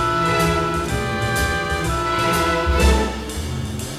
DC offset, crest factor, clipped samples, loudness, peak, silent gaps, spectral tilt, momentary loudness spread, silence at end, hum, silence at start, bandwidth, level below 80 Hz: under 0.1%; 16 dB; under 0.1%; -20 LUFS; -4 dBFS; none; -4.5 dB/octave; 9 LU; 0 s; none; 0 s; 15.5 kHz; -26 dBFS